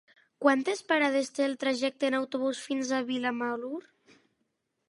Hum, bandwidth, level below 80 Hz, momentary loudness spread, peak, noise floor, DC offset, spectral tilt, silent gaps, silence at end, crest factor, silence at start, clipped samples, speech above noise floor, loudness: none; 11.5 kHz; -84 dBFS; 7 LU; -8 dBFS; -79 dBFS; under 0.1%; -3 dB/octave; none; 1.1 s; 22 dB; 0.4 s; under 0.1%; 50 dB; -29 LUFS